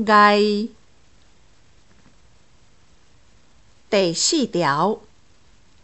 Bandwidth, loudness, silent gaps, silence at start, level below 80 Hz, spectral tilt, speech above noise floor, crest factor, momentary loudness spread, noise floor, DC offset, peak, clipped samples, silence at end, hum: 8.4 kHz; -19 LUFS; none; 0 s; -60 dBFS; -3.5 dB/octave; 39 dB; 20 dB; 12 LU; -57 dBFS; 0.3%; -2 dBFS; under 0.1%; 0.85 s; none